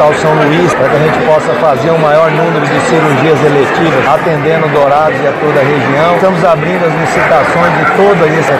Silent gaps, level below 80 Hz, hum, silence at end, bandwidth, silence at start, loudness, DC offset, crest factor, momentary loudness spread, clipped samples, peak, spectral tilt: none; -42 dBFS; none; 0 s; 15.5 kHz; 0 s; -8 LUFS; 0.2%; 8 dB; 2 LU; 0.3%; 0 dBFS; -6 dB/octave